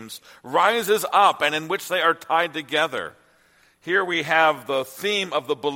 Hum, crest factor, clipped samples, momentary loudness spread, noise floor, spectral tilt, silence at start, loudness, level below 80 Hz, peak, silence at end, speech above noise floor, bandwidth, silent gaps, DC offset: none; 20 dB; under 0.1%; 9 LU; -59 dBFS; -2.5 dB/octave; 0 s; -21 LUFS; -72 dBFS; -4 dBFS; 0 s; 37 dB; 16.5 kHz; none; under 0.1%